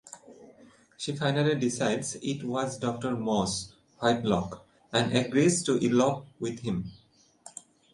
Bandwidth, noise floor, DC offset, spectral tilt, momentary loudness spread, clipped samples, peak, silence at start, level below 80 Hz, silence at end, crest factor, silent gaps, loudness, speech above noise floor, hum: 11.5 kHz; -57 dBFS; under 0.1%; -5 dB/octave; 21 LU; under 0.1%; -8 dBFS; 0.05 s; -60 dBFS; 0.45 s; 20 dB; none; -28 LUFS; 29 dB; none